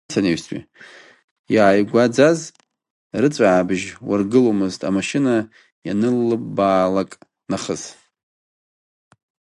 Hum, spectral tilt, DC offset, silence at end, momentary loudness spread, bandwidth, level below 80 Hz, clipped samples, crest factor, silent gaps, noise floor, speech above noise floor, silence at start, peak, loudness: none; -5.5 dB/octave; under 0.1%; 1.65 s; 15 LU; 11.5 kHz; -56 dBFS; under 0.1%; 20 dB; 1.24-1.44 s, 2.90-3.10 s, 5.72-5.82 s; under -90 dBFS; over 72 dB; 0.1 s; 0 dBFS; -19 LUFS